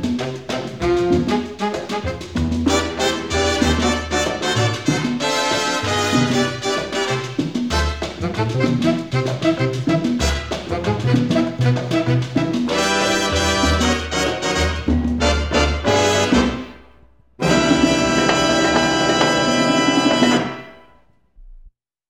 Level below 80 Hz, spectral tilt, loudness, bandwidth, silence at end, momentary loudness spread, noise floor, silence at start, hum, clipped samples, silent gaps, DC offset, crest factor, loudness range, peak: -32 dBFS; -4.5 dB/octave; -18 LUFS; 16 kHz; 0.4 s; 8 LU; -55 dBFS; 0 s; none; under 0.1%; none; 0.3%; 16 dB; 4 LU; -2 dBFS